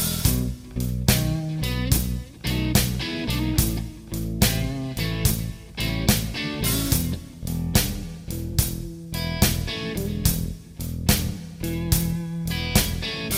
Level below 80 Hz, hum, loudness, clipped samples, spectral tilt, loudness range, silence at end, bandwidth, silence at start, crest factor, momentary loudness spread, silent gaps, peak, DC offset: -32 dBFS; none; -25 LUFS; under 0.1%; -4 dB/octave; 2 LU; 0 s; 17 kHz; 0 s; 20 dB; 10 LU; none; -6 dBFS; under 0.1%